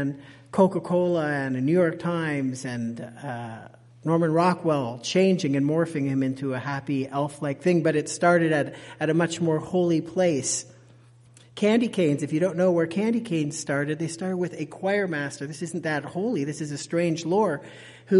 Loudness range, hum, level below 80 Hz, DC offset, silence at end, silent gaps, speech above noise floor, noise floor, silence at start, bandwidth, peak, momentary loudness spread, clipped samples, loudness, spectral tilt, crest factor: 4 LU; none; -68 dBFS; under 0.1%; 0 s; none; 28 dB; -53 dBFS; 0 s; 11.5 kHz; -6 dBFS; 11 LU; under 0.1%; -25 LUFS; -6 dB/octave; 18 dB